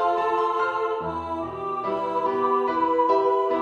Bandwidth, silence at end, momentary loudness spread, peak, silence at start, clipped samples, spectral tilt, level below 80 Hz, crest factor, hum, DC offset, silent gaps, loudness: 7.8 kHz; 0 s; 9 LU; -10 dBFS; 0 s; under 0.1%; -6.5 dB/octave; -56 dBFS; 14 dB; none; under 0.1%; none; -24 LUFS